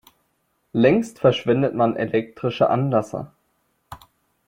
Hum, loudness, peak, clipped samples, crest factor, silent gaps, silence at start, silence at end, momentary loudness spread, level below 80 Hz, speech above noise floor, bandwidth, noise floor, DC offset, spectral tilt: none; -21 LUFS; -4 dBFS; under 0.1%; 18 dB; none; 0.75 s; 0.5 s; 11 LU; -60 dBFS; 50 dB; 16.5 kHz; -69 dBFS; under 0.1%; -7 dB/octave